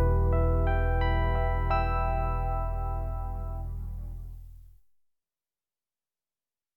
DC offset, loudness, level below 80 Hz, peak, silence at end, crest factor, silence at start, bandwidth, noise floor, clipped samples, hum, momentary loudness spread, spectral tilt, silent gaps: 0.2%; -30 LUFS; -32 dBFS; -14 dBFS; 2.1 s; 14 dB; 0 s; 4.2 kHz; under -90 dBFS; under 0.1%; none; 14 LU; -9 dB/octave; none